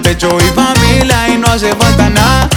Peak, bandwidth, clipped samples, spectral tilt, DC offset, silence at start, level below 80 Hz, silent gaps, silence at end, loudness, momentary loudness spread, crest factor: 0 dBFS; over 20 kHz; 0.3%; -4.5 dB/octave; under 0.1%; 0 s; -18 dBFS; none; 0 s; -9 LUFS; 2 LU; 8 dB